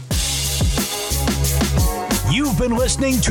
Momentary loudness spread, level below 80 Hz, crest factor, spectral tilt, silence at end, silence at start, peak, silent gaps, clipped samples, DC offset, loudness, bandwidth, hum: 3 LU; -24 dBFS; 14 dB; -4 dB/octave; 0 s; 0 s; -6 dBFS; none; under 0.1%; under 0.1%; -19 LUFS; 19.5 kHz; none